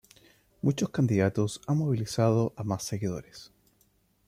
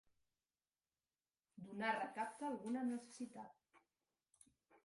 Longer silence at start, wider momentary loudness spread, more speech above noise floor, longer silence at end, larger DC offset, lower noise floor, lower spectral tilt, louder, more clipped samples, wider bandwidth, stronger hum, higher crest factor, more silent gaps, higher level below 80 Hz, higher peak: second, 0.65 s vs 1.55 s; second, 9 LU vs 16 LU; second, 40 dB vs over 45 dB; first, 0.8 s vs 0.1 s; neither; second, -68 dBFS vs under -90 dBFS; first, -6.5 dB/octave vs -4.5 dB/octave; first, -28 LUFS vs -45 LUFS; neither; first, 15.5 kHz vs 11.5 kHz; neither; about the same, 18 dB vs 22 dB; neither; first, -62 dBFS vs under -90 dBFS; first, -12 dBFS vs -26 dBFS